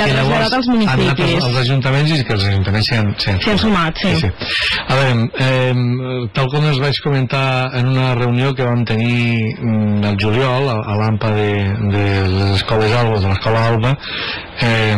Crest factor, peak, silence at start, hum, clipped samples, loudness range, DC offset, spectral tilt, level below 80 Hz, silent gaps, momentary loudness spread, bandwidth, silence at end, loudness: 8 dB; -8 dBFS; 0 s; none; under 0.1%; 1 LU; 1%; -6.5 dB/octave; -38 dBFS; none; 3 LU; 11 kHz; 0 s; -15 LUFS